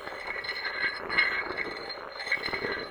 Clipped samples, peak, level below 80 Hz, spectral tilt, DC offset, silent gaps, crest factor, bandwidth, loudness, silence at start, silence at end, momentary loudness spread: under 0.1%; -10 dBFS; -60 dBFS; -3 dB/octave; under 0.1%; none; 22 dB; over 20 kHz; -30 LUFS; 0 s; 0 s; 10 LU